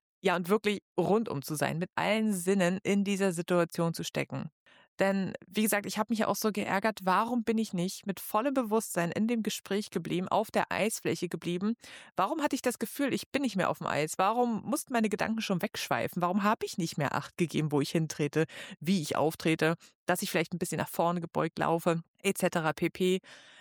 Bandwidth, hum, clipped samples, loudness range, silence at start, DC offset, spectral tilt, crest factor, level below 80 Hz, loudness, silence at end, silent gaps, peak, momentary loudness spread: over 20 kHz; none; under 0.1%; 2 LU; 0.25 s; under 0.1%; -5 dB/octave; 16 dB; -72 dBFS; -31 LUFS; 0.2 s; 0.82-0.96 s, 4.52-4.66 s, 4.88-4.98 s, 13.26-13.32 s, 19.95-20.07 s, 22.08-22.14 s; -14 dBFS; 5 LU